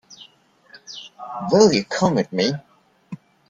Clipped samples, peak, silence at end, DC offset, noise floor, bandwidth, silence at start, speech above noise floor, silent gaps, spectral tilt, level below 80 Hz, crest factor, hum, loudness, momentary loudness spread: under 0.1%; -2 dBFS; 0.35 s; under 0.1%; -54 dBFS; 7.8 kHz; 0.1 s; 35 dB; none; -5 dB/octave; -60 dBFS; 20 dB; none; -19 LUFS; 24 LU